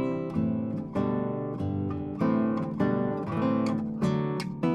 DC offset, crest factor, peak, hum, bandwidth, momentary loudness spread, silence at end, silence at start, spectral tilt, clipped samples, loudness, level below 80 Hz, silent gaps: under 0.1%; 16 dB; -12 dBFS; none; 10.5 kHz; 5 LU; 0 s; 0 s; -8.5 dB/octave; under 0.1%; -29 LUFS; -60 dBFS; none